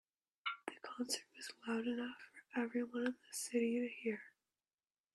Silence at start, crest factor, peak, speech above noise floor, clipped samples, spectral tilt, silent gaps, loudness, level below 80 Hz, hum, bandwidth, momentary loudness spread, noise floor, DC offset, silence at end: 0.45 s; 18 dB; -26 dBFS; over 49 dB; under 0.1%; -3 dB/octave; none; -42 LUFS; -90 dBFS; none; 13.5 kHz; 11 LU; under -90 dBFS; under 0.1%; 0.85 s